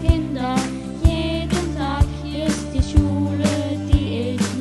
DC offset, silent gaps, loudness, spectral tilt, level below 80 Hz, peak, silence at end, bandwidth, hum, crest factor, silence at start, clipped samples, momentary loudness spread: under 0.1%; none; -21 LUFS; -6 dB/octave; -24 dBFS; -2 dBFS; 0 s; 12.5 kHz; none; 18 dB; 0 s; under 0.1%; 5 LU